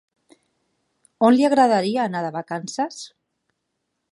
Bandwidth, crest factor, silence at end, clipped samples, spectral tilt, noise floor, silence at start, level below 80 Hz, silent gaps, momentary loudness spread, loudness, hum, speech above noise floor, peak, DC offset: 11.5 kHz; 20 dB; 1.05 s; under 0.1%; -5.5 dB/octave; -77 dBFS; 1.2 s; -74 dBFS; none; 13 LU; -20 LUFS; none; 57 dB; -2 dBFS; under 0.1%